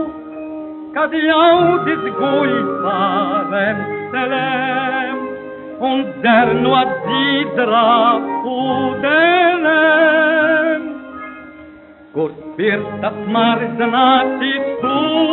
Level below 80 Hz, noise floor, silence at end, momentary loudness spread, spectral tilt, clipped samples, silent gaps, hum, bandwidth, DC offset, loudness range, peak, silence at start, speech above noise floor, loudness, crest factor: -56 dBFS; -40 dBFS; 0 s; 15 LU; -2 dB/octave; under 0.1%; none; none; 4.2 kHz; under 0.1%; 5 LU; -2 dBFS; 0 s; 25 dB; -15 LUFS; 14 dB